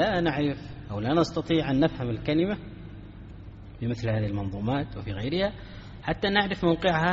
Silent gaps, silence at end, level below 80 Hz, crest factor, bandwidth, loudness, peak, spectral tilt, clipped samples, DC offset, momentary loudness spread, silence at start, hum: none; 0 s; -46 dBFS; 18 dB; 7.6 kHz; -27 LUFS; -8 dBFS; -5 dB/octave; under 0.1%; under 0.1%; 20 LU; 0 s; none